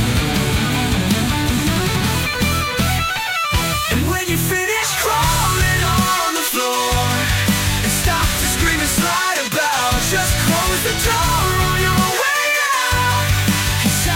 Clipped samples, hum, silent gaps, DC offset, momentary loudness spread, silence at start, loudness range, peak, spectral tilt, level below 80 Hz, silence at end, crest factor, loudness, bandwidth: under 0.1%; none; none; under 0.1%; 2 LU; 0 s; 2 LU; -4 dBFS; -3.5 dB/octave; -28 dBFS; 0 s; 12 dB; -16 LUFS; 17 kHz